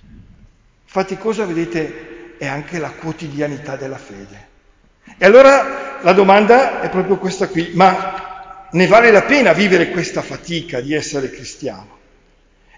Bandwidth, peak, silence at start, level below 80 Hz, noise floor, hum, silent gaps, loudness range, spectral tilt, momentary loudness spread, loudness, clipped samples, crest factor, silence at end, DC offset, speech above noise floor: 7.6 kHz; 0 dBFS; 0.95 s; -48 dBFS; -53 dBFS; none; none; 12 LU; -5.5 dB/octave; 18 LU; -14 LUFS; under 0.1%; 16 dB; 0.95 s; under 0.1%; 39 dB